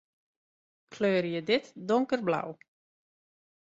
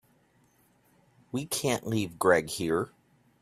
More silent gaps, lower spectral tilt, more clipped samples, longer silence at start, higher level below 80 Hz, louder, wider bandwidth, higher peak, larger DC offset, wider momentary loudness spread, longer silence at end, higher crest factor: neither; first, -6 dB/octave vs -4.5 dB/octave; neither; second, 0.9 s vs 1.35 s; second, -76 dBFS vs -64 dBFS; about the same, -29 LUFS vs -29 LUFS; second, 7.8 kHz vs 15.5 kHz; second, -14 dBFS vs -8 dBFS; neither; second, 5 LU vs 12 LU; first, 1.1 s vs 0.55 s; about the same, 20 dB vs 24 dB